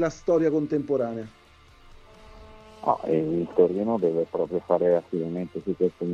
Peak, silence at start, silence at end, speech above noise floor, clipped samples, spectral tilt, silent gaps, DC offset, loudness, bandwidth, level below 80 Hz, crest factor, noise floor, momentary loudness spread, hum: -6 dBFS; 0 s; 0 s; 28 dB; under 0.1%; -8 dB/octave; none; under 0.1%; -25 LUFS; 7.4 kHz; -56 dBFS; 20 dB; -52 dBFS; 9 LU; none